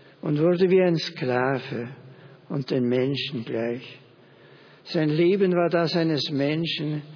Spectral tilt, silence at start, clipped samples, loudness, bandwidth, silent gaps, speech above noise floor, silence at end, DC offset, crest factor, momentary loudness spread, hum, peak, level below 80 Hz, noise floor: -7 dB/octave; 0.25 s; under 0.1%; -24 LUFS; 5.4 kHz; none; 28 dB; 0 s; under 0.1%; 16 dB; 12 LU; none; -10 dBFS; -72 dBFS; -52 dBFS